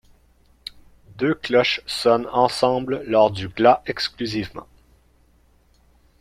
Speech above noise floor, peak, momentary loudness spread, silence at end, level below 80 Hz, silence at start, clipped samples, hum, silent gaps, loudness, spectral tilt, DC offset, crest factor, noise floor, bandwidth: 38 dB; -2 dBFS; 21 LU; 1.6 s; -54 dBFS; 1.15 s; under 0.1%; none; none; -20 LUFS; -5 dB/octave; under 0.1%; 20 dB; -58 dBFS; 15 kHz